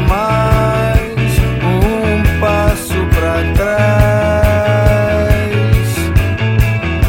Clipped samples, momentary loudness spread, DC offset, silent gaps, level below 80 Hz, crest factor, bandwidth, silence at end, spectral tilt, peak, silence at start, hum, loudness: under 0.1%; 3 LU; under 0.1%; none; -18 dBFS; 12 dB; 17 kHz; 0 s; -6.5 dB/octave; 0 dBFS; 0 s; none; -13 LUFS